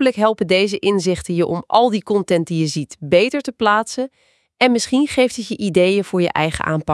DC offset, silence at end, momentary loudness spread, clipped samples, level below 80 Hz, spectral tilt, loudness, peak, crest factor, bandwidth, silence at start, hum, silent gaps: under 0.1%; 0 s; 5 LU; under 0.1%; -50 dBFS; -5 dB/octave; -18 LUFS; 0 dBFS; 18 dB; 12 kHz; 0 s; none; none